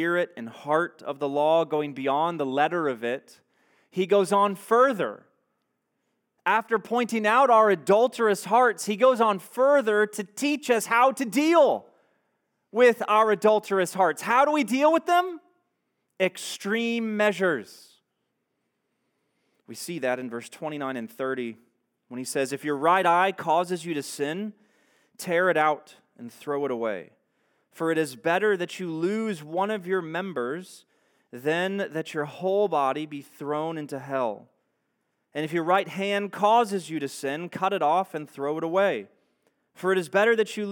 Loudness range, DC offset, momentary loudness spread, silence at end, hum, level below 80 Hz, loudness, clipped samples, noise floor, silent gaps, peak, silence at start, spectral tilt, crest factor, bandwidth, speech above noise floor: 8 LU; under 0.1%; 12 LU; 0 s; none; under -90 dBFS; -25 LUFS; under 0.1%; -78 dBFS; none; -6 dBFS; 0 s; -4.5 dB/octave; 20 dB; 19 kHz; 53 dB